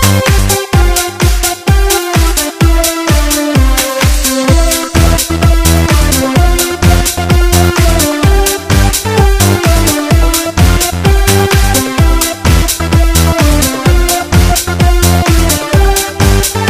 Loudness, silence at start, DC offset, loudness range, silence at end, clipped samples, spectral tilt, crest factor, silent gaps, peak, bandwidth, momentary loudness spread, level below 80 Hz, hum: -9 LUFS; 0 s; under 0.1%; 1 LU; 0 s; 0.2%; -4.5 dB/octave; 8 dB; none; 0 dBFS; 16 kHz; 2 LU; -12 dBFS; none